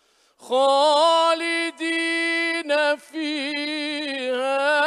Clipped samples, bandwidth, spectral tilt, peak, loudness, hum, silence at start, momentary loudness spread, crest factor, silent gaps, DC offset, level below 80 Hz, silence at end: under 0.1%; 12.5 kHz; -0.5 dB/octave; -8 dBFS; -21 LUFS; none; 0.4 s; 9 LU; 14 dB; none; under 0.1%; -82 dBFS; 0 s